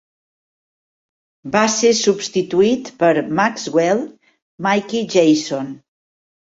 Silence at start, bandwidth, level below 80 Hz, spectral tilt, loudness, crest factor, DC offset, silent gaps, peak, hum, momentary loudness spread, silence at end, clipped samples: 1.45 s; 8 kHz; -60 dBFS; -4 dB/octave; -17 LUFS; 18 dB; under 0.1%; 4.42-4.58 s; -2 dBFS; none; 10 LU; 0.8 s; under 0.1%